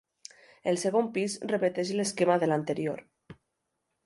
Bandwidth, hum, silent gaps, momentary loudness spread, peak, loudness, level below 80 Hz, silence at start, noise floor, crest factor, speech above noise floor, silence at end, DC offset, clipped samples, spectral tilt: 11.5 kHz; none; none; 17 LU; -10 dBFS; -29 LUFS; -74 dBFS; 0.65 s; -81 dBFS; 20 dB; 53 dB; 0.7 s; under 0.1%; under 0.1%; -5 dB/octave